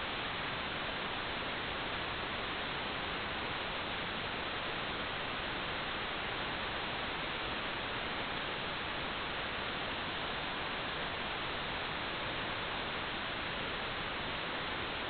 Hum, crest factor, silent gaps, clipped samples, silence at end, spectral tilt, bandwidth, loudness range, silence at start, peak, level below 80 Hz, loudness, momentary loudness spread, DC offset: none; 14 dB; none; under 0.1%; 0 s; -1 dB/octave; 4.9 kHz; 0 LU; 0 s; -24 dBFS; -54 dBFS; -37 LUFS; 0 LU; under 0.1%